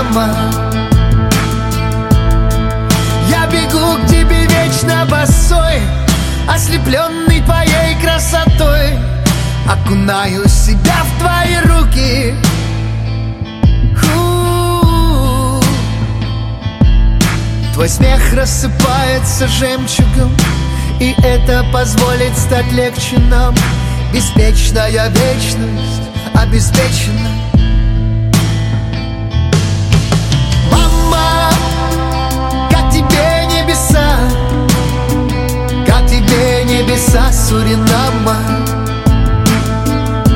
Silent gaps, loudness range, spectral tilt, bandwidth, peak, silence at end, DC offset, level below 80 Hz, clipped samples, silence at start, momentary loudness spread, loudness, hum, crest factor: none; 2 LU; -5 dB/octave; 17 kHz; 0 dBFS; 0 s; under 0.1%; -14 dBFS; under 0.1%; 0 s; 5 LU; -12 LUFS; none; 10 dB